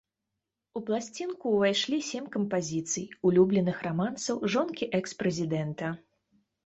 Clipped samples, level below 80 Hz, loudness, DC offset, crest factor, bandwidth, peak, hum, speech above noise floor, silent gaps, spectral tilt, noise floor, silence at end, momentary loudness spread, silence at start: under 0.1%; -66 dBFS; -29 LUFS; under 0.1%; 18 dB; 8.2 kHz; -12 dBFS; none; 57 dB; none; -5 dB/octave; -86 dBFS; 0.65 s; 10 LU; 0.75 s